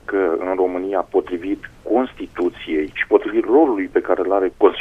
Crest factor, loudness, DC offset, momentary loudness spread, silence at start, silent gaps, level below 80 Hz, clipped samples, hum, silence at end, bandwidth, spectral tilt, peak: 18 dB; -19 LUFS; under 0.1%; 9 LU; 0.1 s; none; -48 dBFS; under 0.1%; none; 0 s; 5.4 kHz; -6.5 dB/octave; 0 dBFS